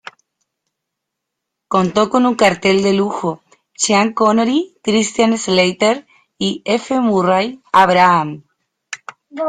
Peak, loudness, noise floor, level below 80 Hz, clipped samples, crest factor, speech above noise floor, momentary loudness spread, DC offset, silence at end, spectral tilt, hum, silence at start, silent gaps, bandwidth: 0 dBFS; -15 LUFS; -78 dBFS; -56 dBFS; under 0.1%; 16 dB; 64 dB; 14 LU; under 0.1%; 0 s; -4 dB/octave; none; 1.7 s; none; 9.8 kHz